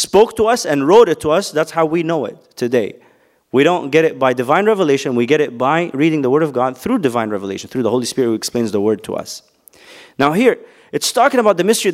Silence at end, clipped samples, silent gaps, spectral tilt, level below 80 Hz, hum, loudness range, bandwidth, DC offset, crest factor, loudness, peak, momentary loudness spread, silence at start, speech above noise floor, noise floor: 0 s; under 0.1%; none; -4.5 dB/octave; -54 dBFS; none; 4 LU; 16 kHz; under 0.1%; 16 dB; -15 LUFS; 0 dBFS; 11 LU; 0 s; 28 dB; -43 dBFS